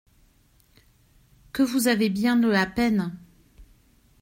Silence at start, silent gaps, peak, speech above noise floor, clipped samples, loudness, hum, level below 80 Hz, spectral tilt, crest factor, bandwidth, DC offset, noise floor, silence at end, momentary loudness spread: 1.55 s; none; -8 dBFS; 38 dB; under 0.1%; -23 LUFS; none; -54 dBFS; -5 dB/octave; 18 dB; 16 kHz; under 0.1%; -60 dBFS; 0.55 s; 14 LU